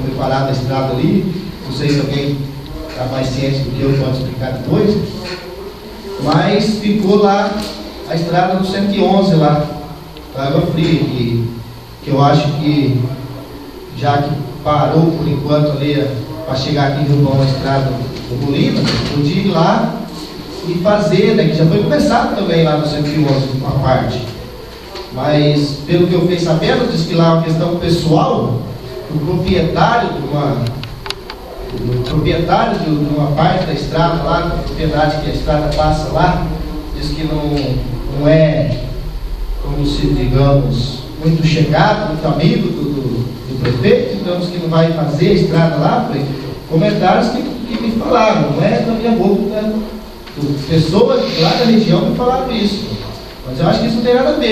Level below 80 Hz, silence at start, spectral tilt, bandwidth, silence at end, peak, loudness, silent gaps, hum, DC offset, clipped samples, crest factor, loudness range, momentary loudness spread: -30 dBFS; 0 s; -7 dB/octave; 14 kHz; 0 s; 0 dBFS; -14 LUFS; none; none; under 0.1%; under 0.1%; 14 dB; 3 LU; 13 LU